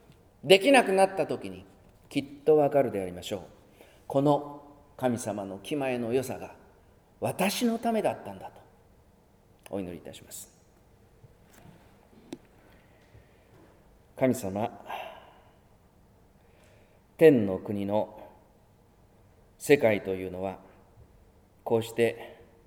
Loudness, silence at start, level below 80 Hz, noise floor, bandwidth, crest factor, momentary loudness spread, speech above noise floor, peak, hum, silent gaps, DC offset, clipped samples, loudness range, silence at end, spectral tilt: -27 LUFS; 0.45 s; -64 dBFS; -60 dBFS; over 20 kHz; 26 dB; 23 LU; 34 dB; -4 dBFS; none; none; under 0.1%; under 0.1%; 17 LU; 0.3 s; -5 dB/octave